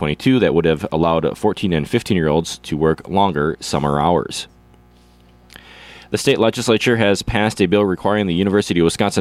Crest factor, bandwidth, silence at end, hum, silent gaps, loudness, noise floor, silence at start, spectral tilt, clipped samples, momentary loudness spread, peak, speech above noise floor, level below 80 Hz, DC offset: 14 dB; 15 kHz; 0 s; 60 Hz at -45 dBFS; none; -17 LUFS; -49 dBFS; 0 s; -5.5 dB/octave; under 0.1%; 5 LU; -2 dBFS; 32 dB; -40 dBFS; under 0.1%